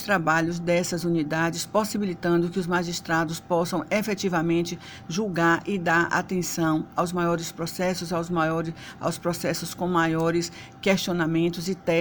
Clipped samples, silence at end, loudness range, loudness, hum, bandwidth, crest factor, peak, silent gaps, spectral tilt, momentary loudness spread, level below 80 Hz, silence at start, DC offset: under 0.1%; 0 s; 2 LU; -25 LUFS; none; over 20 kHz; 16 dB; -8 dBFS; none; -5 dB/octave; 6 LU; -54 dBFS; 0 s; under 0.1%